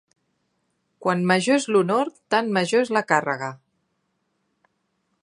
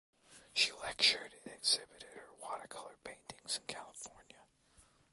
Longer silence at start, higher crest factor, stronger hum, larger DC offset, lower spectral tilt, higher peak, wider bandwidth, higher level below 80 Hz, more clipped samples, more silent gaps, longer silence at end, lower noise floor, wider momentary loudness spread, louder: first, 1 s vs 0.3 s; about the same, 22 dB vs 26 dB; neither; neither; first, -5 dB/octave vs 1 dB/octave; first, -2 dBFS vs -16 dBFS; about the same, 11.5 kHz vs 12 kHz; about the same, -76 dBFS vs -74 dBFS; neither; neither; first, 1.65 s vs 0.7 s; first, -73 dBFS vs -68 dBFS; second, 9 LU vs 21 LU; first, -22 LUFS vs -35 LUFS